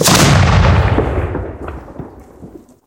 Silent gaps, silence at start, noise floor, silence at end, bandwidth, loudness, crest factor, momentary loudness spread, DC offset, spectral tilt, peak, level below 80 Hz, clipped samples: none; 0 s; -37 dBFS; 0.3 s; 17.5 kHz; -12 LUFS; 14 dB; 23 LU; under 0.1%; -4.5 dB/octave; 0 dBFS; -22 dBFS; under 0.1%